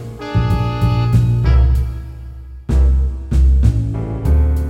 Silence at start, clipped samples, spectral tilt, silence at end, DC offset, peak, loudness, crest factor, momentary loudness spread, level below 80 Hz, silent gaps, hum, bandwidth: 0 s; under 0.1%; -8.5 dB/octave; 0 s; under 0.1%; -2 dBFS; -16 LUFS; 14 dB; 15 LU; -16 dBFS; none; none; 6 kHz